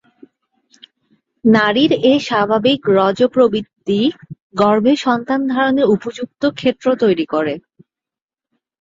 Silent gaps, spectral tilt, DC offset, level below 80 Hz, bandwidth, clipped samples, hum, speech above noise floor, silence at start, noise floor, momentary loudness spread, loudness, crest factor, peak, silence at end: 4.42-4.50 s; -6 dB/octave; under 0.1%; -58 dBFS; 7.8 kHz; under 0.1%; none; 74 dB; 1.45 s; -88 dBFS; 8 LU; -15 LUFS; 16 dB; 0 dBFS; 1.2 s